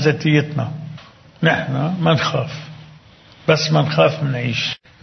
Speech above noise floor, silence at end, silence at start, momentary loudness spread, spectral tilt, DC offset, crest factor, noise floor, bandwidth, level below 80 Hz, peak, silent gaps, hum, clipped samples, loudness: 28 dB; 0.25 s; 0 s; 16 LU; -6 dB/octave; under 0.1%; 18 dB; -46 dBFS; 6.4 kHz; -54 dBFS; 0 dBFS; none; none; under 0.1%; -18 LUFS